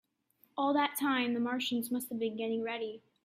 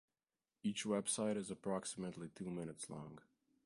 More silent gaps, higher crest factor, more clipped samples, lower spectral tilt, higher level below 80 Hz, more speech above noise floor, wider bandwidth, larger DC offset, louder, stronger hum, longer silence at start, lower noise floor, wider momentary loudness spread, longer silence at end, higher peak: neither; about the same, 18 dB vs 18 dB; neither; about the same, -3.5 dB/octave vs -4 dB/octave; about the same, -80 dBFS vs -78 dBFS; second, 38 dB vs over 47 dB; first, 16 kHz vs 11.5 kHz; neither; first, -33 LUFS vs -43 LUFS; neither; about the same, 0.55 s vs 0.65 s; second, -71 dBFS vs under -90 dBFS; second, 8 LU vs 12 LU; second, 0.25 s vs 0.45 s; first, -18 dBFS vs -26 dBFS